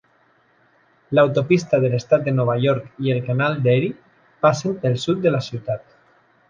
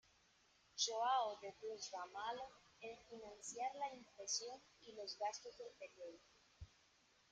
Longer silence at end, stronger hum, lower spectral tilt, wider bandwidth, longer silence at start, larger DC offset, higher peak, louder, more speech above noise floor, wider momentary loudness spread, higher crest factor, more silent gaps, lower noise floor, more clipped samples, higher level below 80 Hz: about the same, 0.7 s vs 0.65 s; neither; first, -7 dB/octave vs -0.5 dB/octave; second, 7.4 kHz vs 9.6 kHz; first, 1.1 s vs 0.75 s; neither; first, -2 dBFS vs -26 dBFS; first, -20 LUFS vs -46 LUFS; first, 40 dB vs 28 dB; second, 8 LU vs 19 LU; about the same, 18 dB vs 22 dB; neither; second, -59 dBFS vs -75 dBFS; neither; first, -58 dBFS vs -78 dBFS